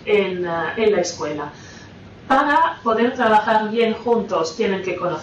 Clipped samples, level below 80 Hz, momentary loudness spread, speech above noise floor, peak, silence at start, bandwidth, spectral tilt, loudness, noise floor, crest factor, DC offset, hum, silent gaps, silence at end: under 0.1%; -54 dBFS; 11 LU; 21 dB; -6 dBFS; 0 s; 9.4 kHz; -4.5 dB/octave; -19 LUFS; -40 dBFS; 12 dB; under 0.1%; none; none; 0 s